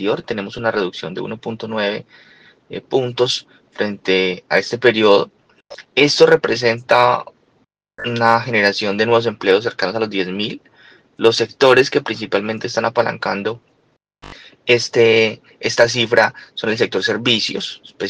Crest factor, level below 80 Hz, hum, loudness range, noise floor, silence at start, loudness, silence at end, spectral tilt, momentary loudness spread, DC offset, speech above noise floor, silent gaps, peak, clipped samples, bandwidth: 18 dB; -60 dBFS; none; 6 LU; -62 dBFS; 0 s; -17 LUFS; 0 s; -4 dB/octave; 13 LU; under 0.1%; 45 dB; none; 0 dBFS; under 0.1%; 10 kHz